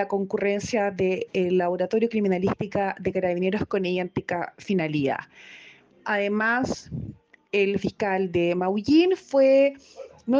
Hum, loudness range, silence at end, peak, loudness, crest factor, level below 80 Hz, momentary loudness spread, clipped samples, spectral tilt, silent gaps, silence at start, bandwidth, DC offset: none; 5 LU; 0 s; -10 dBFS; -24 LUFS; 14 dB; -56 dBFS; 14 LU; under 0.1%; -6.5 dB/octave; none; 0 s; 7.8 kHz; under 0.1%